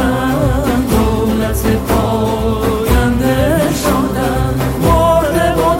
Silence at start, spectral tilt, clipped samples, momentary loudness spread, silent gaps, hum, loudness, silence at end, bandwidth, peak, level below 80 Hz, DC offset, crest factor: 0 s; -6 dB/octave; under 0.1%; 4 LU; none; none; -14 LUFS; 0 s; 17 kHz; -2 dBFS; -22 dBFS; under 0.1%; 10 dB